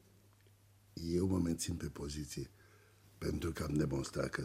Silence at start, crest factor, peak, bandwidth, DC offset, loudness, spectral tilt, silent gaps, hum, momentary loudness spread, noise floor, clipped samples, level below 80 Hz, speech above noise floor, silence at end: 0.95 s; 18 dB; -22 dBFS; 16 kHz; under 0.1%; -39 LUFS; -5.5 dB/octave; none; none; 11 LU; -66 dBFS; under 0.1%; -54 dBFS; 28 dB; 0 s